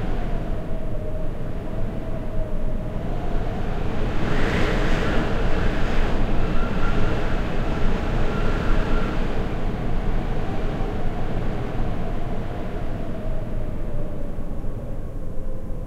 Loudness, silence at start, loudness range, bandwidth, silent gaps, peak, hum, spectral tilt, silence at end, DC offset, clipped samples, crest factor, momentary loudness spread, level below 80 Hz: -28 LUFS; 0 s; 6 LU; 7.2 kHz; none; -6 dBFS; none; -7 dB/octave; 0 s; under 0.1%; under 0.1%; 14 dB; 8 LU; -24 dBFS